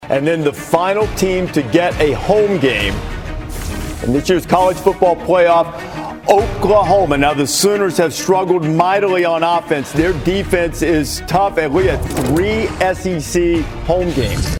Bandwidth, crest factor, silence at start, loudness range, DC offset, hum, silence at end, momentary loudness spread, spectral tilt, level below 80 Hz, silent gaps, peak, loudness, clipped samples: 19.5 kHz; 14 dB; 0 s; 3 LU; under 0.1%; none; 0 s; 7 LU; -5 dB/octave; -30 dBFS; none; 0 dBFS; -15 LUFS; under 0.1%